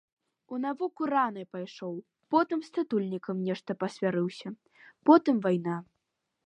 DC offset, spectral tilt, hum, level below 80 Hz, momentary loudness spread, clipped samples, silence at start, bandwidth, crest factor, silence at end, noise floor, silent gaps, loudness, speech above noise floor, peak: under 0.1%; -7.5 dB/octave; none; -80 dBFS; 17 LU; under 0.1%; 0.5 s; 9.4 kHz; 22 dB; 0.65 s; -82 dBFS; none; -29 LUFS; 53 dB; -8 dBFS